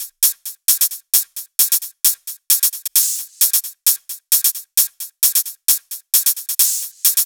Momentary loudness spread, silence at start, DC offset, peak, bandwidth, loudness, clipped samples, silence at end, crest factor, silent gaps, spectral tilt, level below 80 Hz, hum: 3 LU; 0 s; under 0.1%; 0 dBFS; over 20 kHz; -15 LUFS; under 0.1%; 0 s; 18 dB; none; 7 dB/octave; -78 dBFS; none